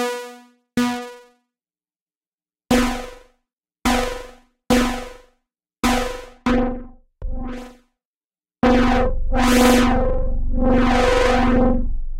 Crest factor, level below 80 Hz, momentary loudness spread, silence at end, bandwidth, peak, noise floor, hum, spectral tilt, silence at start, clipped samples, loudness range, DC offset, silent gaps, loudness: 18 dB; -26 dBFS; 18 LU; 0 s; 16.5 kHz; -2 dBFS; under -90 dBFS; none; -5 dB/octave; 0 s; under 0.1%; 8 LU; under 0.1%; 2.01-2.06 s, 2.17-2.21 s, 8.05-8.21 s; -19 LUFS